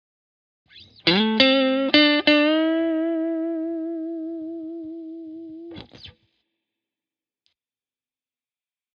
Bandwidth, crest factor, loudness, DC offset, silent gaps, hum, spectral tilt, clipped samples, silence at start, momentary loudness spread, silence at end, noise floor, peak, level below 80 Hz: 6.8 kHz; 24 dB; -20 LUFS; under 0.1%; none; none; -6 dB/octave; under 0.1%; 0.75 s; 22 LU; 2.85 s; under -90 dBFS; 0 dBFS; -64 dBFS